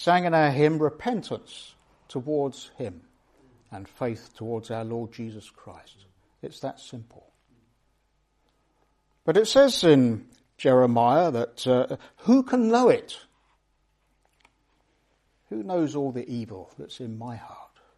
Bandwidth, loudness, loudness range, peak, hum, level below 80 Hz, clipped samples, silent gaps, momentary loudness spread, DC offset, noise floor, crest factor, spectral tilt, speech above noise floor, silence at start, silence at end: 13 kHz; -24 LUFS; 18 LU; -6 dBFS; none; -64 dBFS; under 0.1%; none; 23 LU; under 0.1%; -70 dBFS; 20 dB; -6 dB/octave; 46 dB; 0 s; 0.35 s